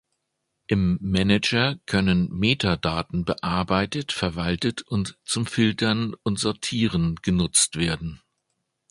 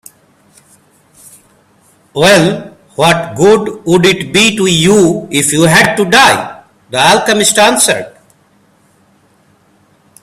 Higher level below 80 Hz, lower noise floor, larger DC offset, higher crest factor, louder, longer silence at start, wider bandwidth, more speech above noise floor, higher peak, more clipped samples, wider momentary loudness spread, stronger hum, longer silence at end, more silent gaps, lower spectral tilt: about the same, -42 dBFS vs -46 dBFS; first, -78 dBFS vs -50 dBFS; neither; first, 20 dB vs 12 dB; second, -23 LUFS vs -9 LUFS; second, 0.7 s vs 2.15 s; second, 11.5 kHz vs 17 kHz; first, 55 dB vs 41 dB; second, -4 dBFS vs 0 dBFS; second, under 0.1% vs 0.2%; second, 7 LU vs 11 LU; neither; second, 0.75 s vs 2.15 s; neither; about the same, -4.5 dB/octave vs -3.5 dB/octave